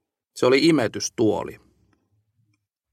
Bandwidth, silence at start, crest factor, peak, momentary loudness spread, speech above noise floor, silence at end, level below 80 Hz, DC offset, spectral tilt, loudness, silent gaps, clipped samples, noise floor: 15 kHz; 0.35 s; 18 dB; -6 dBFS; 16 LU; 51 dB; 1.35 s; -62 dBFS; under 0.1%; -4.5 dB/octave; -21 LUFS; none; under 0.1%; -71 dBFS